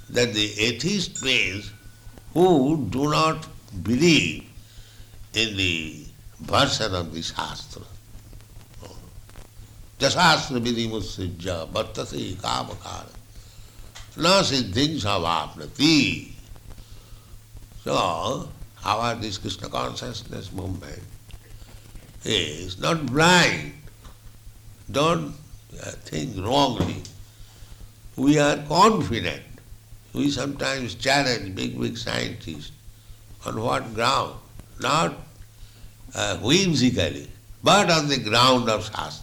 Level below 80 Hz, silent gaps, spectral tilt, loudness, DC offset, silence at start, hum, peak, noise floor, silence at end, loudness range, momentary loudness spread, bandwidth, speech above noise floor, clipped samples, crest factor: -46 dBFS; none; -4 dB/octave; -22 LUFS; under 0.1%; 0 s; none; -6 dBFS; -45 dBFS; 0 s; 7 LU; 19 LU; 19.5 kHz; 22 dB; under 0.1%; 18 dB